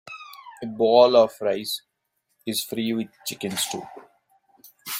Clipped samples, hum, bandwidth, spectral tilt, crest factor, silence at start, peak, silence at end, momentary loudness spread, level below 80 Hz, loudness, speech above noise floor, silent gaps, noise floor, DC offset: under 0.1%; none; 16.5 kHz; -3.5 dB/octave; 20 dB; 0.05 s; -4 dBFS; 0 s; 23 LU; -68 dBFS; -22 LUFS; 53 dB; none; -75 dBFS; under 0.1%